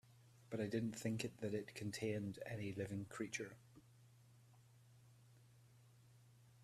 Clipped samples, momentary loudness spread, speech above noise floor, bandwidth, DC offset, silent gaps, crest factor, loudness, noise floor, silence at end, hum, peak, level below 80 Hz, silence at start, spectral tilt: under 0.1%; 24 LU; 23 dB; 14.5 kHz; under 0.1%; none; 20 dB; -46 LUFS; -68 dBFS; 0 s; none; -28 dBFS; -78 dBFS; 0.05 s; -5.5 dB/octave